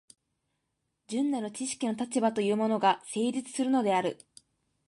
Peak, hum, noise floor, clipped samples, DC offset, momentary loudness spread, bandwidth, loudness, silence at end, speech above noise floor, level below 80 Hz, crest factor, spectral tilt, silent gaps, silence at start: -12 dBFS; none; -81 dBFS; under 0.1%; under 0.1%; 8 LU; 11.5 kHz; -29 LUFS; 0.75 s; 52 dB; -78 dBFS; 20 dB; -4.5 dB/octave; none; 1.1 s